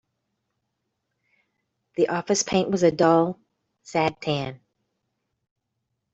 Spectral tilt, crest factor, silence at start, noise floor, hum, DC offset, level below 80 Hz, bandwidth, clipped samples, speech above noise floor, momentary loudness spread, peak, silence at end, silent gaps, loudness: -4.5 dB/octave; 22 dB; 2 s; -79 dBFS; none; under 0.1%; -62 dBFS; 8.2 kHz; under 0.1%; 57 dB; 12 LU; -4 dBFS; 1.6 s; none; -23 LUFS